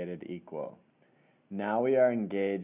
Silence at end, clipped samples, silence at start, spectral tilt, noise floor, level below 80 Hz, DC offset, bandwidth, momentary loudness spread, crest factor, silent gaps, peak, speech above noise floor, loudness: 0 s; under 0.1%; 0 s; -6 dB/octave; -66 dBFS; -76 dBFS; under 0.1%; 3.8 kHz; 16 LU; 18 dB; none; -14 dBFS; 36 dB; -31 LUFS